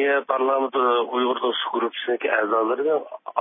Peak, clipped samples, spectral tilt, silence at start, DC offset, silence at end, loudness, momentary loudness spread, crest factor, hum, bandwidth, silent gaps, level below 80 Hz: -6 dBFS; under 0.1%; -7.5 dB/octave; 0 s; under 0.1%; 0 s; -22 LUFS; 4 LU; 16 dB; none; 3.8 kHz; none; under -90 dBFS